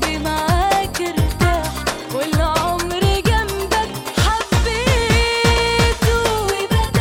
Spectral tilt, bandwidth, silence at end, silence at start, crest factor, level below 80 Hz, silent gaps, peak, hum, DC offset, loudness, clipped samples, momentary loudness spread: -4.5 dB/octave; 17 kHz; 0 s; 0 s; 12 dB; -24 dBFS; none; -4 dBFS; none; under 0.1%; -18 LUFS; under 0.1%; 5 LU